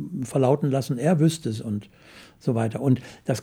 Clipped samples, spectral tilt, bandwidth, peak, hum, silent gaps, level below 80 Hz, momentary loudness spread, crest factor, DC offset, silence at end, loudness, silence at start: under 0.1%; -7 dB/octave; 17 kHz; -6 dBFS; none; none; -62 dBFS; 10 LU; 18 dB; under 0.1%; 0 s; -24 LUFS; 0 s